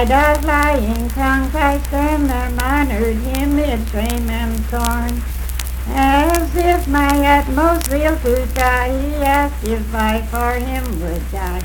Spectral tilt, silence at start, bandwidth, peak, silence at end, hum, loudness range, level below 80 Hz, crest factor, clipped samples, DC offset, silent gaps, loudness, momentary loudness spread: -5.5 dB/octave; 0 s; 19 kHz; 0 dBFS; 0 s; none; 3 LU; -20 dBFS; 16 dB; under 0.1%; under 0.1%; none; -17 LUFS; 8 LU